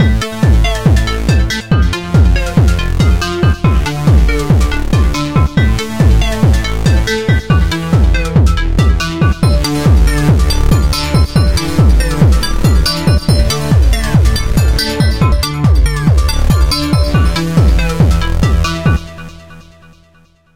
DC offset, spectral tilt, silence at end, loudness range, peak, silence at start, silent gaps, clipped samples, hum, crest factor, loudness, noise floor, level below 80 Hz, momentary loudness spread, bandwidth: 3%; -6 dB/octave; 0 s; 1 LU; 0 dBFS; 0 s; none; under 0.1%; none; 10 dB; -12 LUFS; -48 dBFS; -14 dBFS; 2 LU; 16.5 kHz